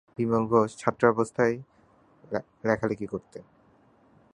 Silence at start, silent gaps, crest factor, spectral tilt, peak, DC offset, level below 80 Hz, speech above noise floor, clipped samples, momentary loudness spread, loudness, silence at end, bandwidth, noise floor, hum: 0.2 s; none; 24 dB; -7 dB/octave; -4 dBFS; under 0.1%; -62 dBFS; 34 dB; under 0.1%; 14 LU; -27 LUFS; 0.95 s; 10.5 kHz; -61 dBFS; none